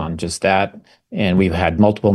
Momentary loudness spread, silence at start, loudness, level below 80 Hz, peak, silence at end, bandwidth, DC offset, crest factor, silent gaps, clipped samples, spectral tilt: 9 LU; 0 s; -17 LUFS; -38 dBFS; -2 dBFS; 0 s; 12.5 kHz; under 0.1%; 16 dB; none; under 0.1%; -6 dB/octave